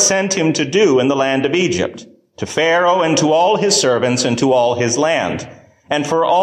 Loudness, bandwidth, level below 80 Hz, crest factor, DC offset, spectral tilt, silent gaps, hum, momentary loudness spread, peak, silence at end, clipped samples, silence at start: -15 LUFS; 15 kHz; -50 dBFS; 14 dB; under 0.1%; -3.5 dB/octave; none; none; 9 LU; -2 dBFS; 0 s; under 0.1%; 0 s